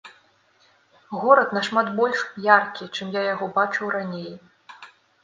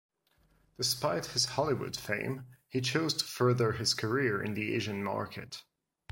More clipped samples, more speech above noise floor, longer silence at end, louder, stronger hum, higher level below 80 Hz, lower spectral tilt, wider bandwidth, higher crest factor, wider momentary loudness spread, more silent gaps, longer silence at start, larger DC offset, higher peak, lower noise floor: neither; about the same, 38 dB vs 38 dB; second, 0.35 s vs 0.5 s; first, -22 LUFS vs -32 LUFS; neither; second, -74 dBFS vs -64 dBFS; about the same, -5 dB/octave vs -4 dB/octave; second, 9.4 kHz vs 16.5 kHz; about the same, 24 dB vs 20 dB; first, 14 LU vs 10 LU; neither; second, 0.05 s vs 0.8 s; neither; first, 0 dBFS vs -12 dBFS; second, -60 dBFS vs -70 dBFS